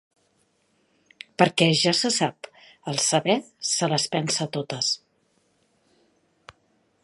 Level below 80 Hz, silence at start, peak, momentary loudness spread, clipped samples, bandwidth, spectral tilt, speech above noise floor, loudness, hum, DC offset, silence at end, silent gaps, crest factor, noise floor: -72 dBFS; 1.4 s; -2 dBFS; 19 LU; under 0.1%; 11.5 kHz; -3 dB/octave; 44 dB; -23 LUFS; none; under 0.1%; 2.1 s; none; 24 dB; -68 dBFS